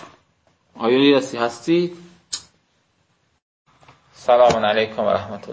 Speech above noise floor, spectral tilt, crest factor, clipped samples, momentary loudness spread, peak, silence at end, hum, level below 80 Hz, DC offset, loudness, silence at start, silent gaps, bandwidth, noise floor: 47 dB; -5 dB/octave; 18 dB; under 0.1%; 16 LU; -2 dBFS; 0 s; none; -56 dBFS; under 0.1%; -19 LUFS; 0 s; 3.42-3.65 s; 8 kHz; -65 dBFS